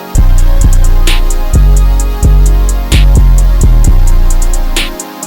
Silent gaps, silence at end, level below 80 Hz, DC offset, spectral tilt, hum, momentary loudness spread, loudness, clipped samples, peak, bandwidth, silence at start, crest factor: none; 0 s; -6 dBFS; under 0.1%; -5 dB/octave; none; 6 LU; -10 LUFS; 0.3%; 0 dBFS; 17 kHz; 0 s; 6 dB